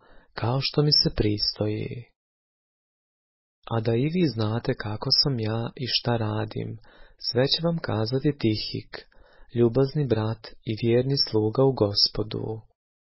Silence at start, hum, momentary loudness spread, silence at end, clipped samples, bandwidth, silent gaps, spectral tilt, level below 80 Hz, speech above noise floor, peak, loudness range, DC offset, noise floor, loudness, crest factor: 0.35 s; none; 14 LU; 0.6 s; under 0.1%; 6 kHz; 2.16-3.62 s; -8.5 dB/octave; -48 dBFS; over 65 dB; -6 dBFS; 5 LU; under 0.1%; under -90 dBFS; -25 LUFS; 20 dB